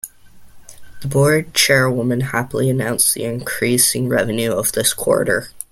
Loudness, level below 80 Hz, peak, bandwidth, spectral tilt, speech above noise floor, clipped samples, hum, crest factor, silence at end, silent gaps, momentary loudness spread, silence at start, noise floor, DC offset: -16 LUFS; -48 dBFS; 0 dBFS; 16.5 kHz; -3.5 dB/octave; 24 dB; under 0.1%; none; 18 dB; 0.1 s; none; 8 LU; 0.05 s; -41 dBFS; under 0.1%